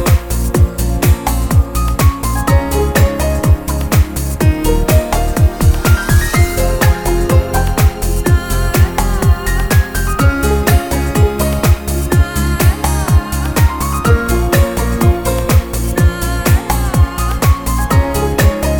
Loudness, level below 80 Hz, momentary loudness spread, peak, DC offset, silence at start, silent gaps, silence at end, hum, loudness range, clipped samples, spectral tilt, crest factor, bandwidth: -14 LUFS; -16 dBFS; 3 LU; 0 dBFS; 0.6%; 0 s; none; 0 s; none; 1 LU; under 0.1%; -5.5 dB/octave; 12 dB; 19.5 kHz